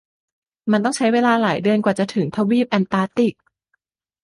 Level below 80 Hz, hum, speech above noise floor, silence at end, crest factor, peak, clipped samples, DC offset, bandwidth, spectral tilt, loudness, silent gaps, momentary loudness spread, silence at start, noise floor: -62 dBFS; none; 53 dB; 0.9 s; 18 dB; -2 dBFS; under 0.1%; under 0.1%; 11.5 kHz; -6 dB/octave; -19 LUFS; none; 5 LU; 0.65 s; -71 dBFS